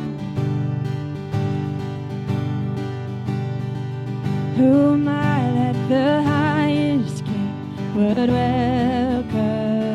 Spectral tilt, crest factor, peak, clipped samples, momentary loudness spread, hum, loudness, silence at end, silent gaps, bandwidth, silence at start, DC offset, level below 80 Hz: -8 dB/octave; 14 dB; -6 dBFS; under 0.1%; 10 LU; none; -21 LUFS; 0 s; none; 11.5 kHz; 0 s; under 0.1%; -46 dBFS